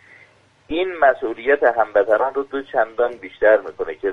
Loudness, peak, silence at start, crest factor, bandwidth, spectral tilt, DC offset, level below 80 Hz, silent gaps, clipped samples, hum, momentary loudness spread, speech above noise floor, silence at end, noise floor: -19 LUFS; -2 dBFS; 0.7 s; 18 dB; 5.8 kHz; -6 dB/octave; under 0.1%; -52 dBFS; none; under 0.1%; none; 9 LU; 34 dB; 0 s; -53 dBFS